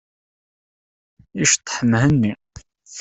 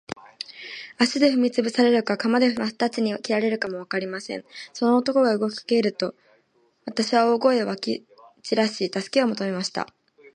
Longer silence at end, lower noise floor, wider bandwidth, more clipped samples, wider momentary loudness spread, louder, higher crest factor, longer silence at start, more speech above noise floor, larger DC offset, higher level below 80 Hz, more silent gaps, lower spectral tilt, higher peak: about the same, 0 s vs 0.05 s; second, -45 dBFS vs -64 dBFS; second, 8.4 kHz vs 10 kHz; neither; first, 20 LU vs 15 LU; first, -18 LUFS vs -23 LUFS; about the same, 20 dB vs 18 dB; first, 1.35 s vs 0.1 s; second, 27 dB vs 42 dB; neither; first, -48 dBFS vs -72 dBFS; neither; about the same, -4 dB/octave vs -4.5 dB/octave; first, -2 dBFS vs -6 dBFS